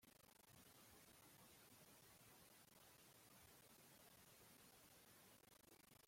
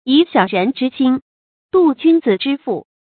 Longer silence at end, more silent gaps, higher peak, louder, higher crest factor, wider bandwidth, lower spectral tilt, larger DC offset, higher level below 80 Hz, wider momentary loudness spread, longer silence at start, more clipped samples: second, 0 s vs 0.25 s; second, none vs 1.22-1.69 s; second, -56 dBFS vs 0 dBFS; second, -68 LUFS vs -16 LUFS; about the same, 14 dB vs 16 dB; first, 16.5 kHz vs 4.6 kHz; second, -2.5 dB/octave vs -11 dB/octave; neither; second, -88 dBFS vs -62 dBFS; second, 2 LU vs 8 LU; about the same, 0 s vs 0.05 s; neither